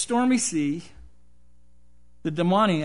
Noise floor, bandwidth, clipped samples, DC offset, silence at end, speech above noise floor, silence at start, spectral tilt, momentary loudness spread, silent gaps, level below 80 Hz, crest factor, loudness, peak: -60 dBFS; 11 kHz; under 0.1%; 0.5%; 0 s; 37 dB; 0 s; -4.5 dB/octave; 13 LU; none; -56 dBFS; 18 dB; -24 LUFS; -8 dBFS